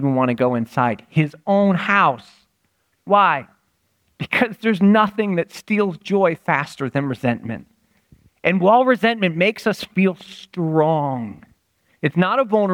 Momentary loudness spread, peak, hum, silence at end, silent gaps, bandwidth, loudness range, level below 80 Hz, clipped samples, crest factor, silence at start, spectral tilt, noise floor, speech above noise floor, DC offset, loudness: 10 LU; -2 dBFS; none; 0 s; none; 15 kHz; 2 LU; -62 dBFS; under 0.1%; 16 dB; 0 s; -7 dB/octave; -67 dBFS; 49 dB; under 0.1%; -19 LUFS